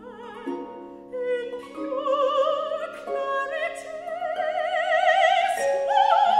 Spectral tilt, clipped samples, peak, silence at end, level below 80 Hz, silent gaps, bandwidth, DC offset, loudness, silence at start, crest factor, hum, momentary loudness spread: -2 dB/octave; under 0.1%; -6 dBFS; 0 s; -68 dBFS; none; 14 kHz; under 0.1%; -24 LUFS; 0 s; 18 dB; none; 16 LU